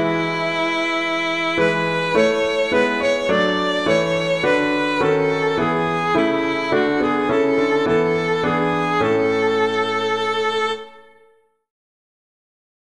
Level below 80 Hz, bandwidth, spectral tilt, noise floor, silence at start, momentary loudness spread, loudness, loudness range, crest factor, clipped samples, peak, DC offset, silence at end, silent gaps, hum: -54 dBFS; 11 kHz; -5 dB/octave; -57 dBFS; 0 s; 2 LU; -19 LUFS; 3 LU; 16 dB; under 0.1%; -4 dBFS; 0.3%; 1.9 s; none; none